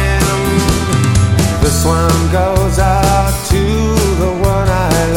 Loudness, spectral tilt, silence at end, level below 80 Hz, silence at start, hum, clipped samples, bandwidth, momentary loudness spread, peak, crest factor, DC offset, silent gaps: -13 LUFS; -5.5 dB/octave; 0 s; -18 dBFS; 0 s; none; under 0.1%; 17.5 kHz; 2 LU; 0 dBFS; 10 dB; under 0.1%; none